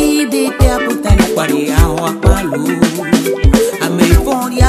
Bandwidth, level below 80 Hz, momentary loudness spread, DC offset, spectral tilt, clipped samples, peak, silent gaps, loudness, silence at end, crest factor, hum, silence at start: 15 kHz; -18 dBFS; 4 LU; under 0.1%; -5.5 dB/octave; 0.2%; 0 dBFS; none; -13 LUFS; 0 s; 12 dB; none; 0 s